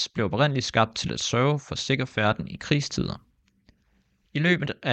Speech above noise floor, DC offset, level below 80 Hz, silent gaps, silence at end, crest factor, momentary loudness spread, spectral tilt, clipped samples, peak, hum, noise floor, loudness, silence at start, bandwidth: 42 dB; under 0.1%; -54 dBFS; none; 0 s; 22 dB; 8 LU; -5 dB/octave; under 0.1%; -4 dBFS; none; -67 dBFS; -25 LUFS; 0 s; 8.8 kHz